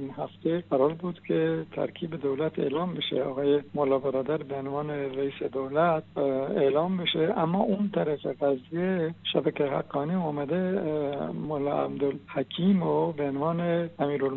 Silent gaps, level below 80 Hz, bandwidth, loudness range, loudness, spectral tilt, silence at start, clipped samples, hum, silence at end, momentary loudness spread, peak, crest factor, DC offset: none; -68 dBFS; 4.2 kHz; 2 LU; -28 LUFS; -5.5 dB/octave; 0 s; under 0.1%; none; 0 s; 7 LU; -8 dBFS; 18 dB; under 0.1%